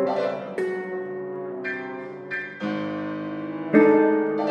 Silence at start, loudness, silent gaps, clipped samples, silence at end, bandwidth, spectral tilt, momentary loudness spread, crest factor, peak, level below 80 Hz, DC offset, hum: 0 s; -25 LUFS; none; under 0.1%; 0 s; 8.6 kHz; -8 dB/octave; 15 LU; 20 dB; -4 dBFS; -74 dBFS; under 0.1%; none